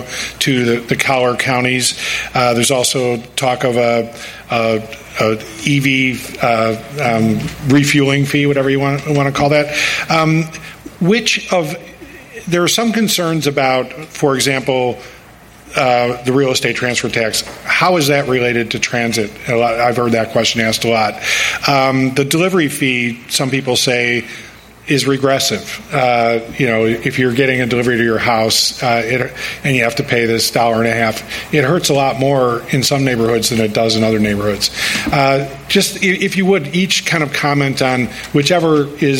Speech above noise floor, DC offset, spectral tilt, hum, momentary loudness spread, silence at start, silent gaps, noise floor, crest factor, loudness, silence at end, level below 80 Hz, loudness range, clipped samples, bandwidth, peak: 25 dB; under 0.1%; -4 dB/octave; none; 6 LU; 0 s; none; -40 dBFS; 14 dB; -14 LUFS; 0 s; -46 dBFS; 2 LU; under 0.1%; 17 kHz; 0 dBFS